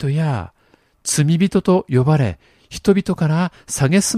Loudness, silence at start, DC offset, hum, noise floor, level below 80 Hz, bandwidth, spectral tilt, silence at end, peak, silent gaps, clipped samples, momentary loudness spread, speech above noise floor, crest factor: -18 LUFS; 0 s; under 0.1%; none; -57 dBFS; -46 dBFS; 14.5 kHz; -5.5 dB/octave; 0 s; 0 dBFS; none; under 0.1%; 12 LU; 40 dB; 16 dB